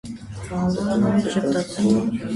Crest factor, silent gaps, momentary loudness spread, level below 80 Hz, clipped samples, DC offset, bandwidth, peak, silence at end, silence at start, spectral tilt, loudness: 14 dB; none; 11 LU; -46 dBFS; under 0.1%; under 0.1%; 11.5 kHz; -8 dBFS; 0 s; 0.05 s; -6.5 dB/octave; -21 LUFS